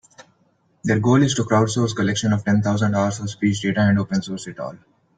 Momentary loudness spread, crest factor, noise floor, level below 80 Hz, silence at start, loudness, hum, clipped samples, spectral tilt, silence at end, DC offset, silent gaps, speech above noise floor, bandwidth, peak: 12 LU; 16 dB; -62 dBFS; -54 dBFS; 0.85 s; -20 LUFS; none; under 0.1%; -6 dB/octave; 0.4 s; under 0.1%; none; 43 dB; 9.2 kHz; -4 dBFS